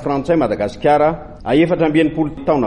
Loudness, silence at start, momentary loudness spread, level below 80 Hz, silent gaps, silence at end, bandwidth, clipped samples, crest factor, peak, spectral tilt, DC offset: -16 LUFS; 0 s; 5 LU; -40 dBFS; none; 0 s; 9.4 kHz; under 0.1%; 12 dB; -4 dBFS; -7.5 dB/octave; under 0.1%